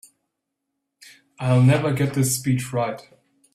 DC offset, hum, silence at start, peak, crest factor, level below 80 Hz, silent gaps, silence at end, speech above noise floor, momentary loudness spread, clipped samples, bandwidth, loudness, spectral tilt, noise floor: under 0.1%; none; 1.4 s; -6 dBFS; 18 dB; -56 dBFS; none; 0.55 s; 60 dB; 12 LU; under 0.1%; 15 kHz; -21 LUFS; -6 dB/octave; -80 dBFS